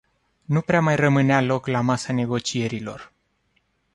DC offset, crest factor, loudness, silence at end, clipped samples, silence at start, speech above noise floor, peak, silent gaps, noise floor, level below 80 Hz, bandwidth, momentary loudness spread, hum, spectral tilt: under 0.1%; 18 dB; -22 LUFS; 0.9 s; under 0.1%; 0.5 s; 47 dB; -4 dBFS; none; -68 dBFS; -56 dBFS; 11.5 kHz; 11 LU; none; -6 dB/octave